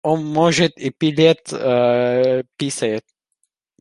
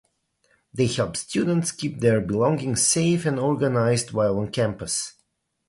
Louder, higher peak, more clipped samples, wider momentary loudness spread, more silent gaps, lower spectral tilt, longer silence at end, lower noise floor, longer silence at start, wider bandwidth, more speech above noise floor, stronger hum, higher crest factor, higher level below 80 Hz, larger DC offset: first, -18 LUFS vs -23 LUFS; first, -2 dBFS vs -6 dBFS; neither; about the same, 7 LU vs 7 LU; neither; about the same, -5 dB/octave vs -4.5 dB/octave; first, 0.8 s vs 0.6 s; about the same, -71 dBFS vs -71 dBFS; second, 0.05 s vs 0.75 s; about the same, 11.5 kHz vs 11.5 kHz; first, 54 dB vs 48 dB; neither; about the same, 16 dB vs 18 dB; second, -60 dBFS vs -54 dBFS; neither